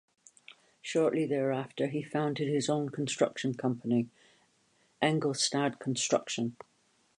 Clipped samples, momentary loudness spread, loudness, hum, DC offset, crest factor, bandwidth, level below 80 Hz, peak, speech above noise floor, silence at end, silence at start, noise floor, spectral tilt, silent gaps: under 0.1%; 5 LU; -31 LUFS; none; under 0.1%; 22 dB; 11 kHz; -78 dBFS; -12 dBFS; 39 dB; 0.65 s; 0.85 s; -70 dBFS; -4.5 dB/octave; none